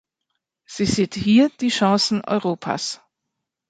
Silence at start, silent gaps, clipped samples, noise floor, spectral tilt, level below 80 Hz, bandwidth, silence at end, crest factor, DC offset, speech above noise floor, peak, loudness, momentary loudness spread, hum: 0.7 s; none; under 0.1%; -81 dBFS; -4.5 dB/octave; -52 dBFS; 9.4 kHz; 0.75 s; 18 dB; under 0.1%; 61 dB; -4 dBFS; -20 LUFS; 11 LU; none